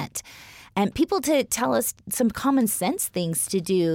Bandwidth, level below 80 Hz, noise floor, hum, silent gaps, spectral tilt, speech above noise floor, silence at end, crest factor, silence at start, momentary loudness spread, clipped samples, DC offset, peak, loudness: 17 kHz; -54 dBFS; -46 dBFS; none; none; -4 dB/octave; 23 dB; 0 s; 14 dB; 0 s; 11 LU; under 0.1%; under 0.1%; -10 dBFS; -24 LUFS